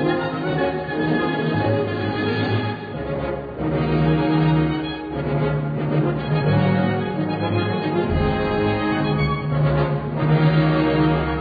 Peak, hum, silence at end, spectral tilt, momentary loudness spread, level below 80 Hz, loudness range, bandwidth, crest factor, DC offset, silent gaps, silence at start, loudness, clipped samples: -6 dBFS; none; 0 s; -10 dB/octave; 7 LU; -38 dBFS; 3 LU; 5 kHz; 14 dB; under 0.1%; none; 0 s; -21 LUFS; under 0.1%